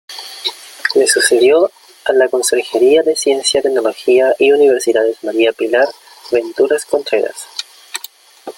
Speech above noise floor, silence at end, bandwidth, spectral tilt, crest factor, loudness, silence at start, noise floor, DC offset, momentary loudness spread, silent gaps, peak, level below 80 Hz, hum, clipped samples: 25 dB; 0.05 s; 17 kHz; -1.5 dB/octave; 14 dB; -13 LUFS; 0.1 s; -37 dBFS; under 0.1%; 15 LU; none; 0 dBFS; -60 dBFS; none; under 0.1%